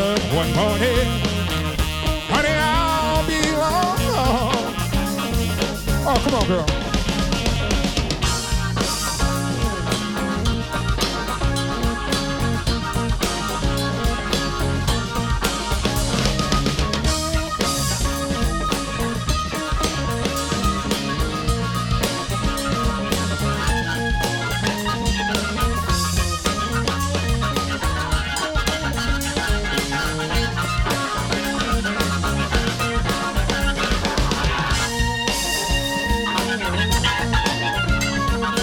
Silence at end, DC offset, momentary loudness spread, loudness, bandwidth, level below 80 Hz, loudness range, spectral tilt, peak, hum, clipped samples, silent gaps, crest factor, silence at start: 0 s; under 0.1%; 4 LU; -21 LUFS; 19.5 kHz; -28 dBFS; 3 LU; -4 dB/octave; -2 dBFS; none; under 0.1%; none; 20 dB; 0 s